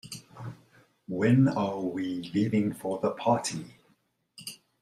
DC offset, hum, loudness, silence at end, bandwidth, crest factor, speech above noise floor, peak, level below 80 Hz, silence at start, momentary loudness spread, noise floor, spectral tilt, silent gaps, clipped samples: under 0.1%; none; -28 LUFS; 0.25 s; 15 kHz; 18 dB; 43 dB; -10 dBFS; -68 dBFS; 0.05 s; 20 LU; -70 dBFS; -6.5 dB/octave; none; under 0.1%